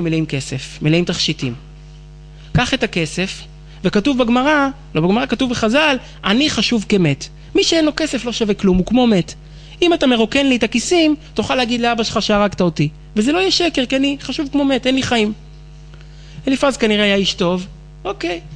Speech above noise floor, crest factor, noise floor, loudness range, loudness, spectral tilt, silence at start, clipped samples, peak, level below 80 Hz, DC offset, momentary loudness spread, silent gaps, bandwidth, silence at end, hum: 21 dB; 16 dB; -37 dBFS; 4 LU; -16 LUFS; -4.5 dB/octave; 0 s; under 0.1%; 0 dBFS; -38 dBFS; under 0.1%; 9 LU; none; 10.5 kHz; 0 s; none